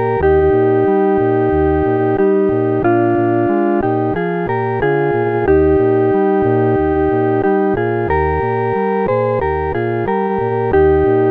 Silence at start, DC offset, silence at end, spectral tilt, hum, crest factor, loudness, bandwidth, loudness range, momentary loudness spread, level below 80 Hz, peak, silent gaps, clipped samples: 0 s; under 0.1%; 0 s; -11 dB/octave; none; 12 dB; -15 LUFS; 4.1 kHz; 2 LU; 5 LU; -32 dBFS; -2 dBFS; none; under 0.1%